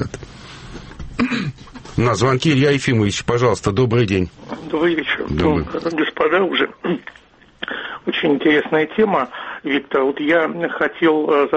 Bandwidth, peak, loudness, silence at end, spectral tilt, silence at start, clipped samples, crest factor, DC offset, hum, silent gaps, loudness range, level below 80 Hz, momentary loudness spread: 8.8 kHz; -4 dBFS; -18 LUFS; 0 s; -6 dB/octave; 0 s; under 0.1%; 14 dB; under 0.1%; none; none; 2 LU; -42 dBFS; 14 LU